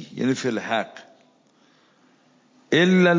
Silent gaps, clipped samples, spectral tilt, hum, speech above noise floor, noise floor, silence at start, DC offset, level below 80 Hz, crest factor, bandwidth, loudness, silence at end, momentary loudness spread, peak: none; under 0.1%; -6 dB/octave; none; 40 dB; -59 dBFS; 0 s; under 0.1%; -74 dBFS; 18 dB; 7.6 kHz; -22 LUFS; 0 s; 10 LU; -6 dBFS